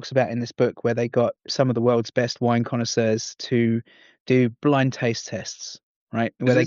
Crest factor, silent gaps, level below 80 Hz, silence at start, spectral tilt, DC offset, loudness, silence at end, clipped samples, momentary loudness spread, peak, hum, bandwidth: 18 dB; 4.20-4.26 s, 5.83-6.07 s; -68 dBFS; 0 s; -5.5 dB/octave; under 0.1%; -23 LUFS; 0 s; under 0.1%; 9 LU; -6 dBFS; none; 7.4 kHz